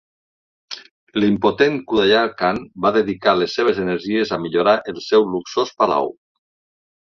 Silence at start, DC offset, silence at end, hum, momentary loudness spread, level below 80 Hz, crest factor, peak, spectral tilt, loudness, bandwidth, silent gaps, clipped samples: 0.7 s; under 0.1%; 1 s; none; 8 LU; -56 dBFS; 18 dB; -2 dBFS; -5.5 dB/octave; -18 LUFS; 7 kHz; 0.91-1.07 s; under 0.1%